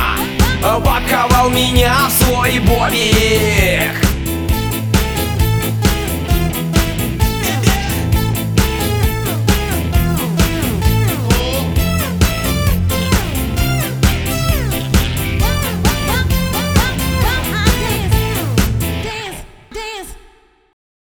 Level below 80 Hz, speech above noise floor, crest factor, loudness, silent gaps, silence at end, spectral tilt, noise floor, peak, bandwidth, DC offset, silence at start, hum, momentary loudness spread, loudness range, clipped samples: -20 dBFS; 34 dB; 14 dB; -15 LUFS; none; 0.95 s; -4.5 dB/octave; -47 dBFS; 0 dBFS; over 20 kHz; under 0.1%; 0 s; none; 6 LU; 4 LU; under 0.1%